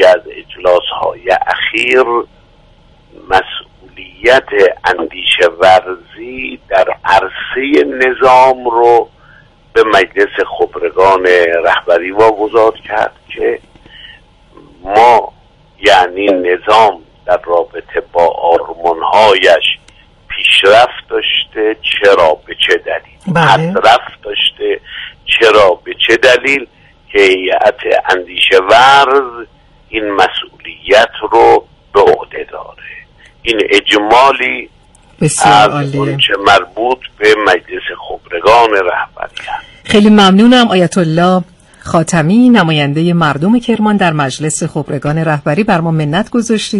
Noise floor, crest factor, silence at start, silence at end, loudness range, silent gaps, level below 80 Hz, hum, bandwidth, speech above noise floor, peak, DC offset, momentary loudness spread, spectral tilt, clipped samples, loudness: -44 dBFS; 10 dB; 0 s; 0 s; 3 LU; none; -42 dBFS; none; 12 kHz; 34 dB; 0 dBFS; under 0.1%; 14 LU; -4.5 dB/octave; 0.5%; -10 LUFS